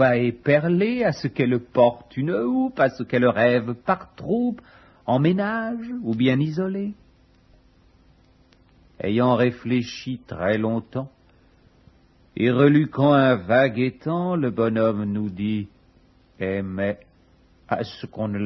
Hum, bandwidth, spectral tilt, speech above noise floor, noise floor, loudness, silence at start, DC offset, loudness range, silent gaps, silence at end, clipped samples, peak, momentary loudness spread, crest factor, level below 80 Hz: none; 6.2 kHz; -8 dB/octave; 35 dB; -56 dBFS; -22 LUFS; 0 s; under 0.1%; 7 LU; none; 0 s; under 0.1%; -4 dBFS; 12 LU; 18 dB; -58 dBFS